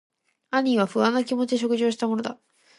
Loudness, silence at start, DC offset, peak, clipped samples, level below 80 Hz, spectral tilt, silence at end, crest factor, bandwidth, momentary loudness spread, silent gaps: -24 LUFS; 0.5 s; under 0.1%; -8 dBFS; under 0.1%; -74 dBFS; -5 dB/octave; 0.45 s; 18 dB; 11.5 kHz; 6 LU; none